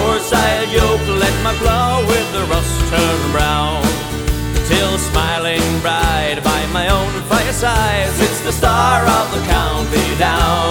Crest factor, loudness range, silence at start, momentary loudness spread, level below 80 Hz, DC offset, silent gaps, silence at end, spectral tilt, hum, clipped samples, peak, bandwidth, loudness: 14 dB; 1 LU; 0 s; 3 LU; -22 dBFS; under 0.1%; none; 0 s; -4 dB/octave; none; under 0.1%; 0 dBFS; over 20 kHz; -15 LUFS